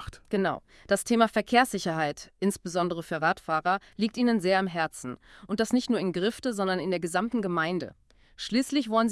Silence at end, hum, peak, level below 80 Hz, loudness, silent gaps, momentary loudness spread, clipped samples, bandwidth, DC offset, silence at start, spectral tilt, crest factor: 0 s; none; -6 dBFS; -58 dBFS; -28 LUFS; none; 9 LU; under 0.1%; 12 kHz; under 0.1%; 0 s; -4.5 dB/octave; 22 dB